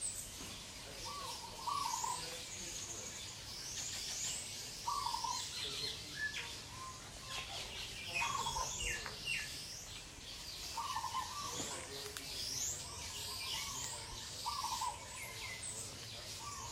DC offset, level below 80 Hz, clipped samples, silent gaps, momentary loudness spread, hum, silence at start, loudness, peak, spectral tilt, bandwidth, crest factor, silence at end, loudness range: under 0.1%; -60 dBFS; under 0.1%; none; 8 LU; none; 0 s; -42 LUFS; -24 dBFS; -0.5 dB/octave; 16 kHz; 20 dB; 0 s; 2 LU